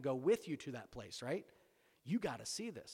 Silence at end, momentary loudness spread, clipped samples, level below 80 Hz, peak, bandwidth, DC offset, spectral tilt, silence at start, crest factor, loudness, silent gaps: 0 s; 13 LU; under 0.1%; -74 dBFS; -24 dBFS; 16.5 kHz; under 0.1%; -5 dB/octave; 0 s; 18 dB; -42 LUFS; none